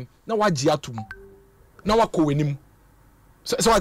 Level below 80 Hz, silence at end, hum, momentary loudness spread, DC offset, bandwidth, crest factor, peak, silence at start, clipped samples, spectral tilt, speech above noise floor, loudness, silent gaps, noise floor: -46 dBFS; 0 s; none; 17 LU; under 0.1%; 16 kHz; 14 dB; -10 dBFS; 0 s; under 0.1%; -5 dB/octave; 33 dB; -23 LUFS; none; -55 dBFS